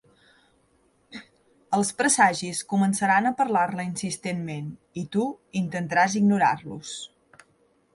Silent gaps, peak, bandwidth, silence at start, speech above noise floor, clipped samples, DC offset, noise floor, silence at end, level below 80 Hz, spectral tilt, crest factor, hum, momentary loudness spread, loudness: none; -6 dBFS; 11.5 kHz; 1.1 s; 40 dB; under 0.1%; under 0.1%; -65 dBFS; 0.9 s; -68 dBFS; -4 dB/octave; 20 dB; none; 16 LU; -24 LUFS